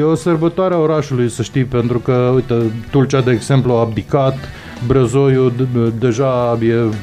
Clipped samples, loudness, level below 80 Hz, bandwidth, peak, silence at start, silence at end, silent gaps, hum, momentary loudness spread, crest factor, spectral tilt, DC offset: under 0.1%; -15 LUFS; -40 dBFS; 10.5 kHz; 0 dBFS; 0 s; 0 s; none; none; 4 LU; 14 dB; -7.5 dB/octave; under 0.1%